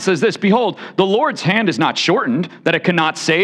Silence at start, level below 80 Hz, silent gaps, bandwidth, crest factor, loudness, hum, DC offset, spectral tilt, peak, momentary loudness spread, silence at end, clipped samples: 0 s; -66 dBFS; none; 11 kHz; 14 dB; -16 LUFS; none; under 0.1%; -5 dB/octave; -2 dBFS; 4 LU; 0 s; under 0.1%